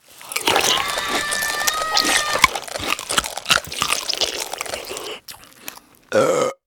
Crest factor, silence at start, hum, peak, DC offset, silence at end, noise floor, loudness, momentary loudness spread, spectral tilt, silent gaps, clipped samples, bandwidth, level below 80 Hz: 22 dB; 0.1 s; none; 0 dBFS; under 0.1%; 0.1 s; -41 dBFS; -19 LUFS; 15 LU; -1 dB/octave; none; under 0.1%; over 20 kHz; -48 dBFS